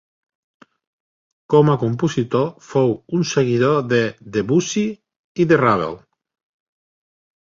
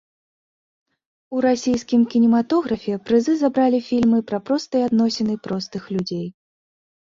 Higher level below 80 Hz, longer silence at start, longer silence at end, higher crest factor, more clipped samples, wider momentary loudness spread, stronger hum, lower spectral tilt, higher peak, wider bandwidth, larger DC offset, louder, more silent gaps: about the same, -56 dBFS vs -58 dBFS; first, 1.5 s vs 1.3 s; first, 1.45 s vs 0.8 s; about the same, 18 dB vs 14 dB; neither; about the same, 8 LU vs 10 LU; neither; about the same, -6 dB/octave vs -6 dB/octave; first, -2 dBFS vs -6 dBFS; about the same, 7.6 kHz vs 7.6 kHz; neither; about the same, -18 LUFS vs -20 LUFS; first, 5.16-5.35 s vs none